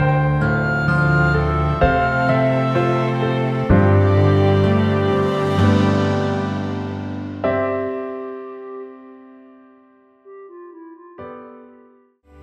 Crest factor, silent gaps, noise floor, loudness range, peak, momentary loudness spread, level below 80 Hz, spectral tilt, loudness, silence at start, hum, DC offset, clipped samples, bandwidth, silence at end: 16 dB; none; -52 dBFS; 16 LU; -2 dBFS; 19 LU; -34 dBFS; -8.5 dB/octave; -18 LUFS; 0 s; none; under 0.1%; under 0.1%; 8 kHz; 0.8 s